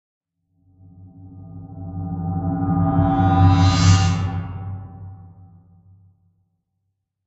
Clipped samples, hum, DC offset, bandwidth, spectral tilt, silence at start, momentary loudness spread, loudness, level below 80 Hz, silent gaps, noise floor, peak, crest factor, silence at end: under 0.1%; none; under 0.1%; 8 kHz; -6.5 dB/octave; 1 s; 24 LU; -19 LUFS; -40 dBFS; none; -75 dBFS; -2 dBFS; 20 dB; 2 s